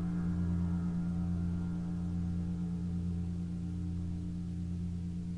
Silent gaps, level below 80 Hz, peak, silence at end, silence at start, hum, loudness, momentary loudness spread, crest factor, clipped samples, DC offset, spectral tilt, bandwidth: none; -50 dBFS; -24 dBFS; 0 s; 0 s; 60 Hz at -50 dBFS; -37 LUFS; 5 LU; 10 dB; under 0.1%; under 0.1%; -9.5 dB/octave; 7.8 kHz